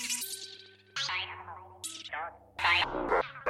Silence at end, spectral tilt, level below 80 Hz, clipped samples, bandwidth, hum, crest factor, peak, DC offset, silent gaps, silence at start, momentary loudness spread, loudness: 0 s; -1 dB/octave; -58 dBFS; under 0.1%; 16.5 kHz; none; 20 dB; -14 dBFS; under 0.1%; none; 0 s; 18 LU; -32 LUFS